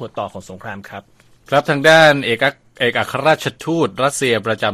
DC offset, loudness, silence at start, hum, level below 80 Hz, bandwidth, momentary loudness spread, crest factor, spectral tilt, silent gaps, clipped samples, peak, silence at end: under 0.1%; -15 LUFS; 0 s; none; -56 dBFS; 15.5 kHz; 21 LU; 16 dB; -4 dB/octave; none; under 0.1%; 0 dBFS; 0 s